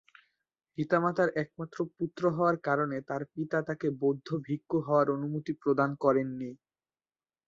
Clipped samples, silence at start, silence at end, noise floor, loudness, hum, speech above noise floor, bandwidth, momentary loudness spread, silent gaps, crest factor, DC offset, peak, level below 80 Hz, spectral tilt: under 0.1%; 0.8 s; 0.9 s; under -90 dBFS; -31 LUFS; none; over 60 dB; 7.6 kHz; 10 LU; none; 20 dB; under 0.1%; -12 dBFS; -72 dBFS; -8.5 dB/octave